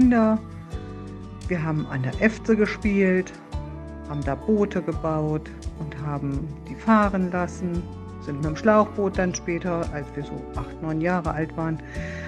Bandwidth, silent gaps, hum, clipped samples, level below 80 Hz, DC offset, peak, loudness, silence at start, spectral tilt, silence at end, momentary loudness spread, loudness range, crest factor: 10 kHz; none; none; under 0.1%; -40 dBFS; under 0.1%; -4 dBFS; -25 LUFS; 0 s; -7 dB/octave; 0 s; 16 LU; 4 LU; 20 dB